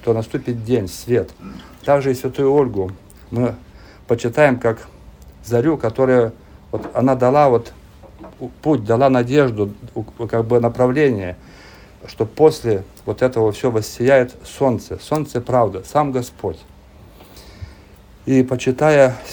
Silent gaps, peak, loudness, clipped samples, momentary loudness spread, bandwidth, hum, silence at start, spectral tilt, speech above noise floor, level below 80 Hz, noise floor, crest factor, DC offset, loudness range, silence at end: none; 0 dBFS; -18 LUFS; under 0.1%; 16 LU; over 20 kHz; none; 0 s; -7 dB/octave; 27 dB; -46 dBFS; -44 dBFS; 18 dB; under 0.1%; 4 LU; 0 s